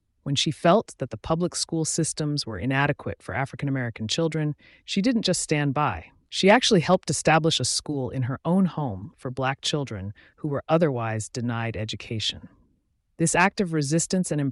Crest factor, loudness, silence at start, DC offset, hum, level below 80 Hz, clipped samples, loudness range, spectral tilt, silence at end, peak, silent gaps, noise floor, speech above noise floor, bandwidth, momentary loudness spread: 18 dB; -24 LUFS; 0.25 s; under 0.1%; none; -54 dBFS; under 0.1%; 5 LU; -4.5 dB/octave; 0 s; -8 dBFS; none; -69 dBFS; 45 dB; 11.5 kHz; 12 LU